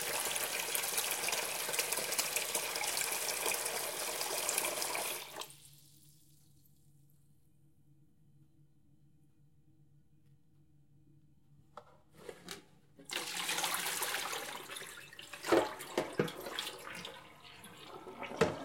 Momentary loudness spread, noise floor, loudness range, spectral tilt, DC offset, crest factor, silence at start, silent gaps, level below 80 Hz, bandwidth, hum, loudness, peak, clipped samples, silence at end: 19 LU; -69 dBFS; 14 LU; -1.5 dB/octave; under 0.1%; 28 dB; 0 s; none; -74 dBFS; 17 kHz; none; -36 LUFS; -12 dBFS; under 0.1%; 0 s